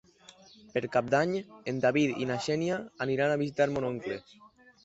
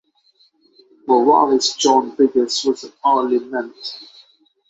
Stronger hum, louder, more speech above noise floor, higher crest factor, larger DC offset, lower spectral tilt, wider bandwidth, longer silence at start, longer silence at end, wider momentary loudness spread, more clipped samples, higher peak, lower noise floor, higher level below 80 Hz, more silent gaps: neither; second, -30 LUFS vs -17 LUFS; second, 27 dB vs 41 dB; about the same, 18 dB vs 16 dB; neither; first, -6 dB/octave vs -2.5 dB/octave; about the same, 8.2 kHz vs 8 kHz; second, 0.75 s vs 1.05 s; about the same, 0.65 s vs 0.65 s; second, 9 LU vs 17 LU; neither; second, -12 dBFS vs -2 dBFS; about the same, -56 dBFS vs -58 dBFS; about the same, -66 dBFS vs -66 dBFS; neither